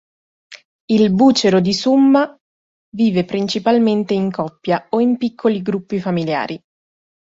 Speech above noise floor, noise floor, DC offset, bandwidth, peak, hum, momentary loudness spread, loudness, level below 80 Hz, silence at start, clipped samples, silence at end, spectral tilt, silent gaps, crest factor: over 74 dB; under -90 dBFS; under 0.1%; 7.8 kHz; -2 dBFS; none; 10 LU; -16 LUFS; -56 dBFS; 0.5 s; under 0.1%; 0.85 s; -6 dB/octave; 0.65-0.88 s, 2.41-2.92 s; 14 dB